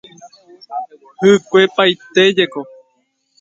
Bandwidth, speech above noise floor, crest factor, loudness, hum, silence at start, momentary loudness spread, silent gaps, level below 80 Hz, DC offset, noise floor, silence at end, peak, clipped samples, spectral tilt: 7.8 kHz; 51 dB; 16 dB; -13 LUFS; none; 0.25 s; 18 LU; none; -62 dBFS; under 0.1%; -64 dBFS; 0.8 s; 0 dBFS; under 0.1%; -4.5 dB/octave